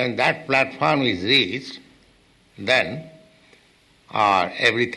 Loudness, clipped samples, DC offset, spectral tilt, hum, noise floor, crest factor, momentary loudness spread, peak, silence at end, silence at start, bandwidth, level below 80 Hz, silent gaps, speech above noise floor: -20 LUFS; under 0.1%; under 0.1%; -4.5 dB/octave; none; -57 dBFS; 18 dB; 14 LU; -6 dBFS; 0 s; 0 s; 12 kHz; -60 dBFS; none; 36 dB